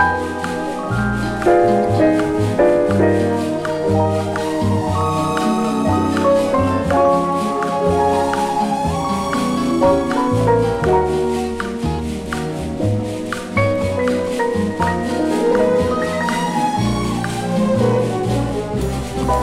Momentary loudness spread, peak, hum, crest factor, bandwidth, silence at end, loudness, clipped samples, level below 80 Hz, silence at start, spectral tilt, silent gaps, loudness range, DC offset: 7 LU; -2 dBFS; none; 14 dB; 16 kHz; 0 s; -18 LUFS; under 0.1%; -36 dBFS; 0 s; -6.5 dB/octave; none; 4 LU; under 0.1%